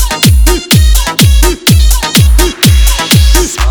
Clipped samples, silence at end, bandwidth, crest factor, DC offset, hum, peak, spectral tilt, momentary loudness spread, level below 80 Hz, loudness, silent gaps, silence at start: 0.8%; 0 s; over 20 kHz; 6 dB; 0.2%; none; 0 dBFS; -4 dB/octave; 2 LU; -8 dBFS; -7 LUFS; none; 0 s